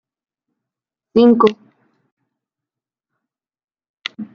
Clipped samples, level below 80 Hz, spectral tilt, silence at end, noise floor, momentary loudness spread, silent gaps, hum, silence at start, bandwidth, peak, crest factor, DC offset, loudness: under 0.1%; -64 dBFS; -7 dB/octave; 0.1 s; -87 dBFS; 19 LU; 2.12-2.17 s, 3.64-3.68 s, 3.89-3.94 s; none; 1.15 s; 6.8 kHz; -2 dBFS; 20 dB; under 0.1%; -14 LUFS